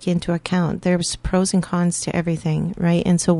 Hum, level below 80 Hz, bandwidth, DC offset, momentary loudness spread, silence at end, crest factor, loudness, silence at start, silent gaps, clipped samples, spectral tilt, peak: none; -40 dBFS; 11.5 kHz; under 0.1%; 4 LU; 0 s; 16 dB; -20 LUFS; 0 s; none; under 0.1%; -5.5 dB/octave; -4 dBFS